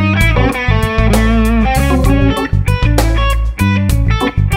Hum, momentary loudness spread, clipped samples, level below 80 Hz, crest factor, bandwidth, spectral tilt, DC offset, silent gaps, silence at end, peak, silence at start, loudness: none; 3 LU; under 0.1%; -16 dBFS; 10 dB; 16.5 kHz; -6 dB/octave; under 0.1%; none; 0 s; 0 dBFS; 0 s; -13 LUFS